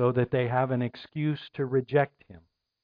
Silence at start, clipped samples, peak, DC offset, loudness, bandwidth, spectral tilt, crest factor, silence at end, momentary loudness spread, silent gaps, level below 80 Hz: 0 s; under 0.1%; -12 dBFS; under 0.1%; -28 LUFS; 5.2 kHz; -10.5 dB/octave; 16 dB; 0.45 s; 7 LU; none; -64 dBFS